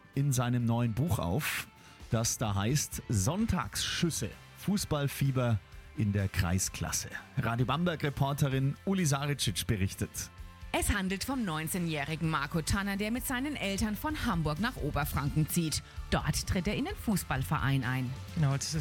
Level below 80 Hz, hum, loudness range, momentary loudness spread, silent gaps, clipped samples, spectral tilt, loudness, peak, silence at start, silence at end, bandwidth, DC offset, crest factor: -46 dBFS; none; 1 LU; 5 LU; none; under 0.1%; -4.5 dB/octave; -32 LUFS; -16 dBFS; 0.05 s; 0 s; 17.5 kHz; under 0.1%; 16 dB